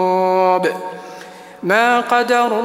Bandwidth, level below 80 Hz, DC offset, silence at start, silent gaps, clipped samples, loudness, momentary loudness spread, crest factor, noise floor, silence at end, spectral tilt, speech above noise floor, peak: 16 kHz; -68 dBFS; under 0.1%; 0 s; none; under 0.1%; -15 LUFS; 20 LU; 16 dB; -36 dBFS; 0 s; -4.5 dB/octave; 21 dB; 0 dBFS